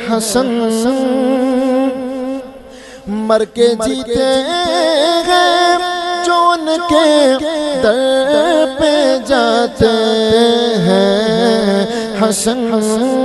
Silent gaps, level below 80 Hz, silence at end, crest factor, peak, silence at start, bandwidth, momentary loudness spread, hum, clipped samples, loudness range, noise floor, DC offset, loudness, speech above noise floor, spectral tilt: none; -44 dBFS; 0 s; 12 dB; 0 dBFS; 0 s; 12.5 kHz; 6 LU; none; under 0.1%; 4 LU; -34 dBFS; under 0.1%; -13 LUFS; 22 dB; -4 dB/octave